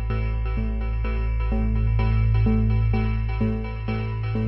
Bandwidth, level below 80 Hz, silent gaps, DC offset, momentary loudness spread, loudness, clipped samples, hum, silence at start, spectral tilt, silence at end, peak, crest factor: 5.6 kHz; -24 dBFS; none; under 0.1%; 6 LU; -24 LUFS; under 0.1%; none; 0 s; -11 dB/octave; 0 s; -10 dBFS; 10 dB